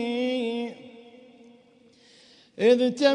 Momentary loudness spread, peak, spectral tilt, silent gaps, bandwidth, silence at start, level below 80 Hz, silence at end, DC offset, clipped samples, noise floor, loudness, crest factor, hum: 26 LU; -8 dBFS; -4.5 dB/octave; none; 10.5 kHz; 0 s; -78 dBFS; 0 s; under 0.1%; under 0.1%; -57 dBFS; -24 LUFS; 18 dB; none